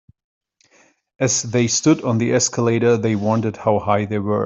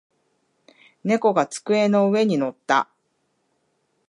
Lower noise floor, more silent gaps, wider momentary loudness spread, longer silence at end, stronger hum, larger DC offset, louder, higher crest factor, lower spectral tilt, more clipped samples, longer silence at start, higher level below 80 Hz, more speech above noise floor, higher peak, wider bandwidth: second, -57 dBFS vs -70 dBFS; neither; about the same, 4 LU vs 6 LU; second, 0 s vs 1.25 s; neither; neither; first, -18 LUFS vs -21 LUFS; about the same, 16 dB vs 20 dB; about the same, -4.5 dB/octave vs -5.5 dB/octave; neither; first, 1.2 s vs 1.05 s; first, -56 dBFS vs -76 dBFS; second, 39 dB vs 51 dB; about the same, -4 dBFS vs -4 dBFS; second, 8.2 kHz vs 11.5 kHz